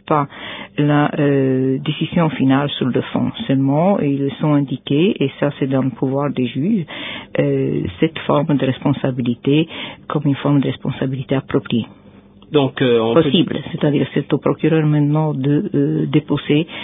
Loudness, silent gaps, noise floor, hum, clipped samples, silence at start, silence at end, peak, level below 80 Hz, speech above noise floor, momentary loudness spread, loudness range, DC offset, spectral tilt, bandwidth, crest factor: -18 LUFS; none; -44 dBFS; none; under 0.1%; 0.05 s; 0 s; 0 dBFS; -50 dBFS; 27 dB; 6 LU; 3 LU; under 0.1%; -12.5 dB/octave; 3.8 kHz; 16 dB